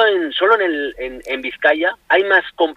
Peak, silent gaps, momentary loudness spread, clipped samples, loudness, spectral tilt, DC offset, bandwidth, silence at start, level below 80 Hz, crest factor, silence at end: -2 dBFS; none; 11 LU; under 0.1%; -16 LUFS; -3.5 dB/octave; under 0.1%; 9.4 kHz; 0 s; -52 dBFS; 16 dB; 0.05 s